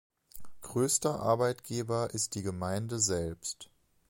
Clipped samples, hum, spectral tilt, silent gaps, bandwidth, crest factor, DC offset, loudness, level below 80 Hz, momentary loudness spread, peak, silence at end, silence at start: under 0.1%; none; -4 dB/octave; none; 17 kHz; 18 dB; under 0.1%; -32 LUFS; -58 dBFS; 10 LU; -14 dBFS; 0.45 s; 0.35 s